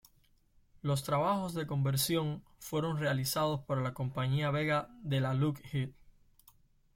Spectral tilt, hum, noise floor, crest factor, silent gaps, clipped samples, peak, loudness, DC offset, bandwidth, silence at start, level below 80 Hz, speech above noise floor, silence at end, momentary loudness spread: -5.5 dB/octave; none; -68 dBFS; 14 dB; none; under 0.1%; -20 dBFS; -33 LUFS; under 0.1%; 16.5 kHz; 0.85 s; -62 dBFS; 35 dB; 1.05 s; 7 LU